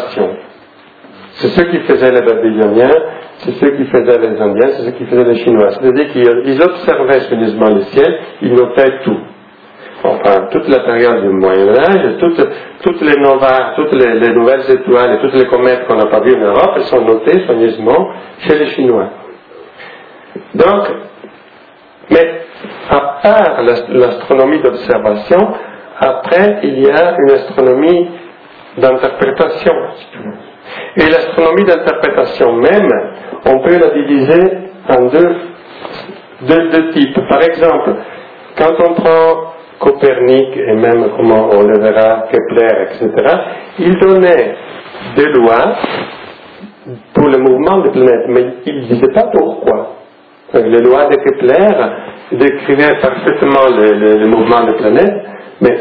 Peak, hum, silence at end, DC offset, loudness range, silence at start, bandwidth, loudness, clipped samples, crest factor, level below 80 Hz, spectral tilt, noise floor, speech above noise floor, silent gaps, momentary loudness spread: 0 dBFS; none; 0 s; under 0.1%; 3 LU; 0 s; 5.4 kHz; -10 LUFS; 0.6%; 10 dB; -46 dBFS; -9 dB/octave; -40 dBFS; 31 dB; none; 13 LU